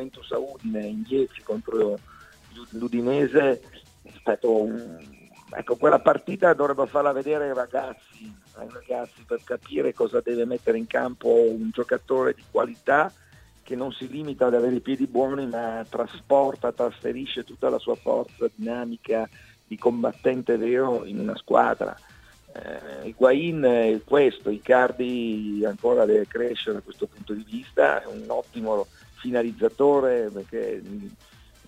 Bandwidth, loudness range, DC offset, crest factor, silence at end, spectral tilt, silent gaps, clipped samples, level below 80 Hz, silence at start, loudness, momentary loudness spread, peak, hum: 12 kHz; 5 LU; under 0.1%; 22 dB; 0.6 s; -6.5 dB/octave; none; under 0.1%; -60 dBFS; 0 s; -24 LUFS; 15 LU; -4 dBFS; none